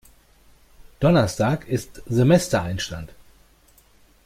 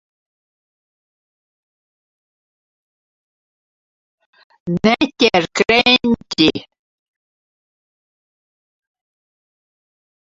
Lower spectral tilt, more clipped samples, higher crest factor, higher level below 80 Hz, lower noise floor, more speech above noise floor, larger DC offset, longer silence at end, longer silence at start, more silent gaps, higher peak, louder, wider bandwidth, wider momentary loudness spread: first, -6 dB/octave vs -4.5 dB/octave; neither; about the same, 20 dB vs 22 dB; first, -46 dBFS vs -52 dBFS; second, -56 dBFS vs under -90 dBFS; second, 35 dB vs over 75 dB; neither; second, 1.2 s vs 3.65 s; second, 1 s vs 4.65 s; neither; second, -4 dBFS vs 0 dBFS; second, -21 LUFS vs -15 LUFS; first, 16 kHz vs 7.8 kHz; about the same, 13 LU vs 12 LU